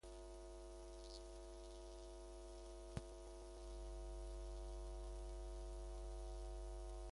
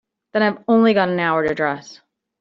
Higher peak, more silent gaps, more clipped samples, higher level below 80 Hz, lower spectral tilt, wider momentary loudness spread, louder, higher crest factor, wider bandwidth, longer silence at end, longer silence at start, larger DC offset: second, -32 dBFS vs -4 dBFS; neither; neither; first, -52 dBFS vs -60 dBFS; about the same, -5.5 dB/octave vs -6.5 dB/octave; second, 4 LU vs 9 LU; second, -55 LUFS vs -18 LUFS; about the same, 20 dB vs 16 dB; first, 11.5 kHz vs 7.2 kHz; second, 0 s vs 0.45 s; second, 0.05 s vs 0.35 s; neither